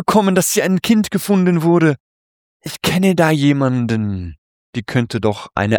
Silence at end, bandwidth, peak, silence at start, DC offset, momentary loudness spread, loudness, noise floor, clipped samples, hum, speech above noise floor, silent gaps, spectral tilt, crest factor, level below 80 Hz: 0 s; 19.5 kHz; -2 dBFS; 0 s; under 0.1%; 14 LU; -16 LUFS; under -90 dBFS; under 0.1%; none; over 75 dB; 2.00-2.60 s, 4.38-4.73 s; -5.5 dB/octave; 14 dB; -46 dBFS